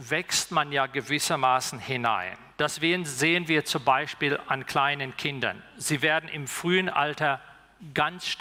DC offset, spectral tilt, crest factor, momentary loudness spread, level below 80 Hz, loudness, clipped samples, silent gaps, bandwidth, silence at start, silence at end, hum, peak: under 0.1%; -3 dB/octave; 18 dB; 7 LU; -66 dBFS; -26 LUFS; under 0.1%; none; 18 kHz; 0 s; 0 s; none; -8 dBFS